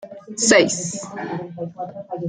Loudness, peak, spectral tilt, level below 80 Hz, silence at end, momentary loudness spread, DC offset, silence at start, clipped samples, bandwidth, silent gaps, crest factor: -19 LUFS; -2 dBFS; -3 dB/octave; -62 dBFS; 0 s; 18 LU; under 0.1%; 0 s; under 0.1%; 10.5 kHz; none; 20 dB